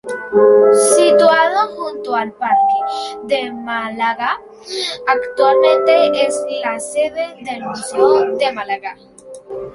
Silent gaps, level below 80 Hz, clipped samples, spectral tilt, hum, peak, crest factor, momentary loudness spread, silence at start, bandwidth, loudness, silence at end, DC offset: none; -60 dBFS; under 0.1%; -2.5 dB/octave; none; 0 dBFS; 16 dB; 14 LU; 0.05 s; 12 kHz; -15 LUFS; 0 s; under 0.1%